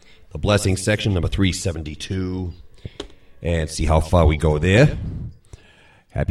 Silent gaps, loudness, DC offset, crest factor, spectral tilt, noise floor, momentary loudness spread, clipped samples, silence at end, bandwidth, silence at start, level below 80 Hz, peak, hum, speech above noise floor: none; -20 LUFS; under 0.1%; 20 dB; -6 dB/octave; -51 dBFS; 21 LU; under 0.1%; 0.05 s; 13.5 kHz; 0.35 s; -30 dBFS; 0 dBFS; none; 32 dB